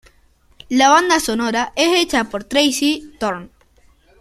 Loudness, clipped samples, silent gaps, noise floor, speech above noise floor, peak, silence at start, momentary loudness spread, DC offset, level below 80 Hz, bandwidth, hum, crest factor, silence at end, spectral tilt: -16 LUFS; under 0.1%; none; -54 dBFS; 38 dB; 0 dBFS; 0.7 s; 12 LU; under 0.1%; -48 dBFS; 15 kHz; none; 18 dB; 0.75 s; -2 dB/octave